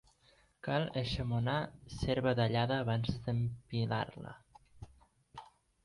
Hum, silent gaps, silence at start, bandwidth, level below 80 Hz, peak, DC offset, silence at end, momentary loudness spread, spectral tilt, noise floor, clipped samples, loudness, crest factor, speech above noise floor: none; none; 0.65 s; 11.5 kHz; -54 dBFS; -20 dBFS; under 0.1%; 0.4 s; 23 LU; -7 dB/octave; -68 dBFS; under 0.1%; -35 LUFS; 18 dB; 34 dB